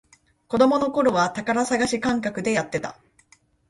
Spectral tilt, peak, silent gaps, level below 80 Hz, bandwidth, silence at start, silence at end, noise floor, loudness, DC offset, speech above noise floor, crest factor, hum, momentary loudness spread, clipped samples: -4.5 dB/octave; -4 dBFS; none; -56 dBFS; 11.5 kHz; 0.5 s; 0.75 s; -59 dBFS; -22 LUFS; under 0.1%; 37 dB; 20 dB; none; 10 LU; under 0.1%